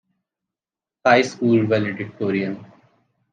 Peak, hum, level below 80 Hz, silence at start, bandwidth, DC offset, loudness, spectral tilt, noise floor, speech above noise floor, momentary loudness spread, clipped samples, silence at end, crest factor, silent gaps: -2 dBFS; none; -70 dBFS; 1.05 s; 9.2 kHz; under 0.1%; -20 LUFS; -6 dB/octave; -90 dBFS; 71 dB; 11 LU; under 0.1%; 0.7 s; 20 dB; none